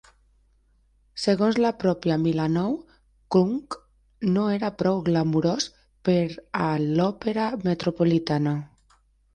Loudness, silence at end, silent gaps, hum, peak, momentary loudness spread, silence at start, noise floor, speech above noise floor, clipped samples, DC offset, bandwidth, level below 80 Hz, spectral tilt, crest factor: -24 LUFS; 0.7 s; none; none; -8 dBFS; 8 LU; 1.15 s; -63 dBFS; 39 dB; under 0.1%; under 0.1%; 9.8 kHz; -56 dBFS; -6.5 dB/octave; 16 dB